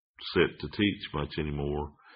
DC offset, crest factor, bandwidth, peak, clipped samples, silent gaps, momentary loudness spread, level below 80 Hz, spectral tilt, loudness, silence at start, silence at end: under 0.1%; 20 dB; 5.2 kHz; -10 dBFS; under 0.1%; none; 7 LU; -46 dBFS; -4 dB/octave; -31 LUFS; 0.2 s; 0 s